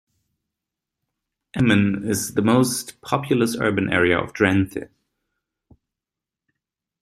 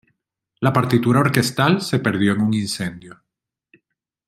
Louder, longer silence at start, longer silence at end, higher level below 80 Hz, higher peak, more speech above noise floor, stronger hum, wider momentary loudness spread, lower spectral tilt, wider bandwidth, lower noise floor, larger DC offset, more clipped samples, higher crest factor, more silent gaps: about the same, -20 LUFS vs -19 LUFS; first, 1.55 s vs 0.6 s; first, 2.15 s vs 1.15 s; about the same, -56 dBFS vs -58 dBFS; about the same, -2 dBFS vs 0 dBFS; first, 68 dB vs 57 dB; neither; about the same, 9 LU vs 7 LU; about the same, -5 dB/octave vs -5.5 dB/octave; about the same, 15.5 kHz vs 16 kHz; first, -88 dBFS vs -75 dBFS; neither; neither; about the same, 22 dB vs 20 dB; neither